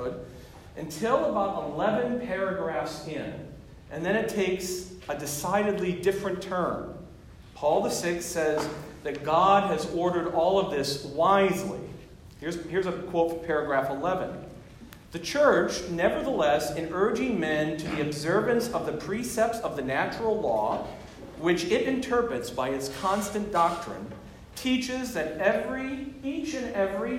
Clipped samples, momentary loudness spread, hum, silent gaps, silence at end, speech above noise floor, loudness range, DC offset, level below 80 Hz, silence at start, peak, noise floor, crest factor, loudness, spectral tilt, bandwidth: under 0.1%; 15 LU; none; none; 0 s; 21 dB; 4 LU; under 0.1%; -52 dBFS; 0 s; -8 dBFS; -48 dBFS; 20 dB; -28 LUFS; -4.5 dB/octave; 16 kHz